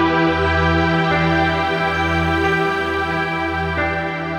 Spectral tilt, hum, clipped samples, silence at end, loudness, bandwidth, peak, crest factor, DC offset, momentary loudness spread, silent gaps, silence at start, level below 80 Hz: -6.5 dB/octave; none; under 0.1%; 0 s; -18 LUFS; 11.5 kHz; -4 dBFS; 14 dB; under 0.1%; 4 LU; none; 0 s; -34 dBFS